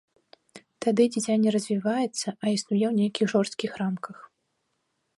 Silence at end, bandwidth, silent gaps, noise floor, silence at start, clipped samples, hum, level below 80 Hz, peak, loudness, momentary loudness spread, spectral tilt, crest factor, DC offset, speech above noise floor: 0.95 s; 11.5 kHz; none; -76 dBFS; 0.55 s; under 0.1%; none; -72 dBFS; -10 dBFS; -26 LUFS; 7 LU; -5 dB/octave; 18 dB; under 0.1%; 51 dB